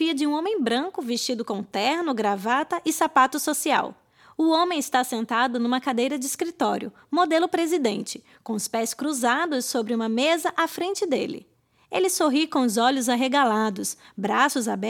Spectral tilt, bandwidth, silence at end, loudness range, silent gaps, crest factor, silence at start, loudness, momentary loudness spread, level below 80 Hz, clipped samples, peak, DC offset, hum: -3 dB/octave; 18 kHz; 0 s; 2 LU; none; 20 dB; 0 s; -24 LUFS; 8 LU; -74 dBFS; under 0.1%; -4 dBFS; under 0.1%; none